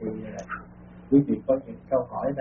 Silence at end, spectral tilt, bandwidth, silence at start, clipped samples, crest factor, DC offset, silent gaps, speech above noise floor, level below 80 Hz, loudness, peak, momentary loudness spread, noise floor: 0 s; -6 dB/octave; 3.7 kHz; 0 s; under 0.1%; 18 dB; under 0.1%; none; 22 dB; -54 dBFS; -26 LUFS; -8 dBFS; 16 LU; -46 dBFS